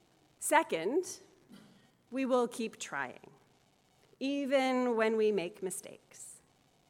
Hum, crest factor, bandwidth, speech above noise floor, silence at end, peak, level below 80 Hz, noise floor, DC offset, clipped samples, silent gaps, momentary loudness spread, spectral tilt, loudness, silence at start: none; 24 dB; 17.5 kHz; 36 dB; 0.55 s; -12 dBFS; -84 dBFS; -69 dBFS; under 0.1%; under 0.1%; none; 20 LU; -3.5 dB/octave; -33 LUFS; 0.4 s